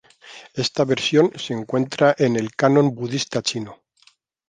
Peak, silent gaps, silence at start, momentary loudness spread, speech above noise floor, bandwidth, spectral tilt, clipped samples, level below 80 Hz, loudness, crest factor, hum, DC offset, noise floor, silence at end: -2 dBFS; none; 0.25 s; 13 LU; 39 dB; 9.8 kHz; -5 dB/octave; under 0.1%; -62 dBFS; -20 LUFS; 18 dB; none; under 0.1%; -58 dBFS; 0.75 s